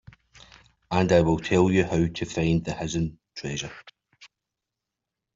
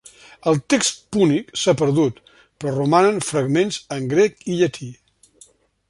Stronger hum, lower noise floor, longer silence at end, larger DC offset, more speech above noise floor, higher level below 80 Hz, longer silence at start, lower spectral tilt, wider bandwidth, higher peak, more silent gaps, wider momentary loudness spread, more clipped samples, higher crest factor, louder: neither; first, -86 dBFS vs -53 dBFS; first, 1.1 s vs 0.95 s; neither; first, 62 dB vs 34 dB; first, -48 dBFS vs -58 dBFS; first, 0.9 s vs 0.45 s; about the same, -6 dB/octave vs -5 dB/octave; second, 7.8 kHz vs 11.5 kHz; second, -6 dBFS vs -2 dBFS; neither; about the same, 12 LU vs 10 LU; neither; about the same, 20 dB vs 18 dB; second, -25 LUFS vs -19 LUFS